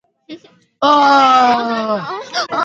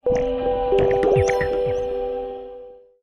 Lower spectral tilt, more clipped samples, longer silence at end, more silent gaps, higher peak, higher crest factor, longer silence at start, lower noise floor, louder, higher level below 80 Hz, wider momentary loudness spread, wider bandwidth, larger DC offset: second, -3.5 dB/octave vs -6.5 dB/octave; neither; second, 0 s vs 0.25 s; neither; first, 0 dBFS vs -6 dBFS; about the same, 14 dB vs 14 dB; first, 0.3 s vs 0.05 s; about the same, -39 dBFS vs -41 dBFS; first, -13 LUFS vs -21 LUFS; second, -66 dBFS vs -38 dBFS; second, 12 LU vs 16 LU; second, 8 kHz vs 9.8 kHz; neither